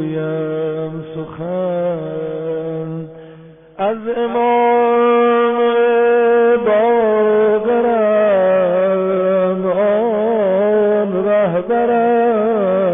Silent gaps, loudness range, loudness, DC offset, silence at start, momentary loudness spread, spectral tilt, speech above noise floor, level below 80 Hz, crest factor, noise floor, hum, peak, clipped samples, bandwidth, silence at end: none; 9 LU; -15 LUFS; under 0.1%; 0 s; 10 LU; -12 dB/octave; 24 dB; -56 dBFS; 10 dB; -40 dBFS; none; -6 dBFS; under 0.1%; 3.7 kHz; 0 s